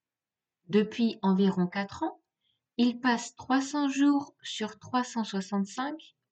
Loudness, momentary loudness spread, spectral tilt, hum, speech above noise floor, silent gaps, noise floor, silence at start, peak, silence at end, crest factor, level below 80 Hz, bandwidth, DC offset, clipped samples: -29 LUFS; 10 LU; -5.5 dB/octave; none; over 61 dB; none; under -90 dBFS; 0.7 s; -14 dBFS; 0.3 s; 16 dB; -74 dBFS; 8.6 kHz; under 0.1%; under 0.1%